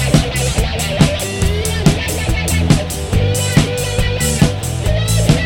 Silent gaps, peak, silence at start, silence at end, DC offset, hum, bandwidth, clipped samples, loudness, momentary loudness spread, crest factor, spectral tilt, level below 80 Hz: none; 0 dBFS; 0 s; 0 s; under 0.1%; none; 17.5 kHz; under 0.1%; -15 LUFS; 4 LU; 14 dB; -5 dB/octave; -22 dBFS